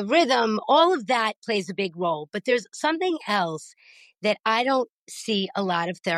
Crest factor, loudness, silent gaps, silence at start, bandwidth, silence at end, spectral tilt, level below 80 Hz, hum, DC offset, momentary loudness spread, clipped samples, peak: 18 dB; -24 LUFS; 1.36-1.42 s, 4.40-4.44 s, 4.89-5.07 s; 0 s; 13.5 kHz; 0 s; -4 dB/octave; -78 dBFS; none; under 0.1%; 9 LU; under 0.1%; -6 dBFS